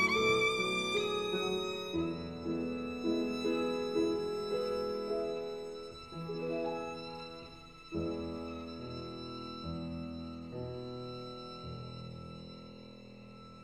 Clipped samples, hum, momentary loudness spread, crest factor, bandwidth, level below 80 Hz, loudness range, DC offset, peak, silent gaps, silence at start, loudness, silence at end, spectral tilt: under 0.1%; none; 16 LU; 20 dB; 15 kHz; -64 dBFS; 9 LU; under 0.1%; -18 dBFS; none; 0 s; -37 LUFS; 0 s; -5 dB/octave